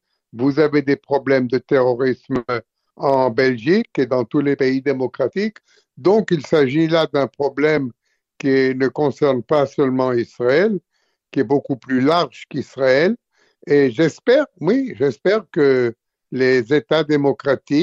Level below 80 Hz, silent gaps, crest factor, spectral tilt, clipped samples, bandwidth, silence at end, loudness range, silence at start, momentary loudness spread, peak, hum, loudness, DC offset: -60 dBFS; none; 14 dB; -7 dB/octave; under 0.1%; 7.6 kHz; 0 s; 1 LU; 0.35 s; 7 LU; -4 dBFS; none; -18 LUFS; under 0.1%